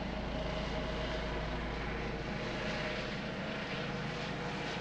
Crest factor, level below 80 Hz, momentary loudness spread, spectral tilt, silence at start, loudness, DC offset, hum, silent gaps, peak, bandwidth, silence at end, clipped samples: 12 dB; -46 dBFS; 2 LU; -5.5 dB/octave; 0 s; -38 LUFS; under 0.1%; none; none; -24 dBFS; 9.2 kHz; 0 s; under 0.1%